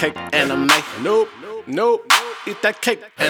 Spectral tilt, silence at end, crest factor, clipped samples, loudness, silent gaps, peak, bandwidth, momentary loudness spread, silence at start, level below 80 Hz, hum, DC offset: -2.5 dB/octave; 0 s; 18 dB; under 0.1%; -18 LUFS; none; 0 dBFS; over 20 kHz; 10 LU; 0 s; -60 dBFS; none; under 0.1%